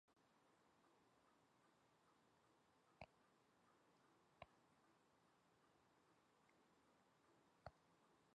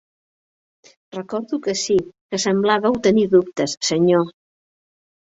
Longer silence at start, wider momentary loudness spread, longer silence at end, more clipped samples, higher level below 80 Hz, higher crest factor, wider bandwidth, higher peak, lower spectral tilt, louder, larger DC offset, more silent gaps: second, 0.05 s vs 1.15 s; second, 2 LU vs 11 LU; second, 0 s vs 0.95 s; neither; second, -88 dBFS vs -58 dBFS; first, 34 dB vs 18 dB; first, 9 kHz vs 8 kHz; second, -40 dBFS vs -4 dBFS; about the same, -5 dB/octave vs -4.5 dB/octave; second, -68 LUFS vs -19 LUFS; neither; second, none vs 2.21-2.29 s